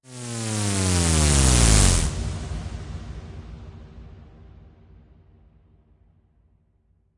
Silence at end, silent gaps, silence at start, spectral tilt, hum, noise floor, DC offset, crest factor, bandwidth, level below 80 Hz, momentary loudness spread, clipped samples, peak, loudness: 2.95 s; none; 0.1 s; -3.5 dB/octave; none; -64 dBFS; under 0.1%; 20 dB; 11.5 kHz; -30 dBFS; 24 LU; under 0.1%; -4 dBFS; -21 LUFS